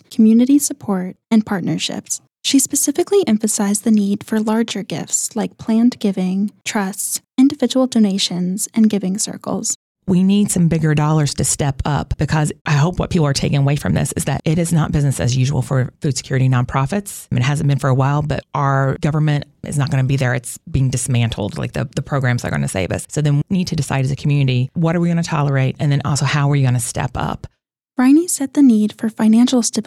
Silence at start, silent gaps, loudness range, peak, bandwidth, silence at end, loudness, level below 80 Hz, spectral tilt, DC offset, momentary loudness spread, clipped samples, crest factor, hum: 0.1 s; 9.75-9.95 s, 12.61-12.65 s; 3 LU; -4 dBFS; 14.5 kHz; 0.05 s; -17 LUFS; -40 dBFS; -5.5 dB/octave; under 0.1%; 8 LU; under 0.1%; 12 dB; none